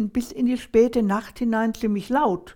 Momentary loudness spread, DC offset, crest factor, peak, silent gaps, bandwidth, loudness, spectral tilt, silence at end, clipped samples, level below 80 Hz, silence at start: 6 LU; under 0.1%; 16 dB; -6 dBFS; none; 16.5 kHz; -23 LUFS; -6.5 dB/octave; 0.05 s; under 0.1%; -48 dBFS; 0 s